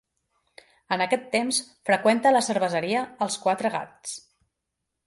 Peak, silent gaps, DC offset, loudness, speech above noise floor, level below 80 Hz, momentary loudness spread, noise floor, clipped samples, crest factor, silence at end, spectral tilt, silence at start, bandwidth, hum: -6 dBFS; none; under 0.1%; -24 LUFS; 58 dB; -72 dBFS; 14 LU; -82 dBFS; under 0.1%; 20 dB; 0.9 s; -3 dB/octave; 0.9 s; 11.5 kHz; none